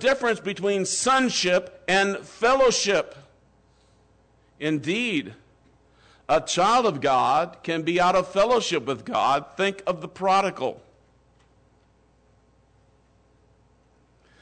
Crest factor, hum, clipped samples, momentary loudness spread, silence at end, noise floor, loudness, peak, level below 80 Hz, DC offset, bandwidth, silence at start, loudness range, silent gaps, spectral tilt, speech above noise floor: 14 dB; 60 Hz at -60 dBFS; under 0.1%; 9 LU; 3.65 s; -61 dBFS; -23 LUFS; -12 dBFS; -58 dBFS; under 0.1%; 9.4 kHz; 0 s; 8 LU; none; -3 dB/octave; 38 dB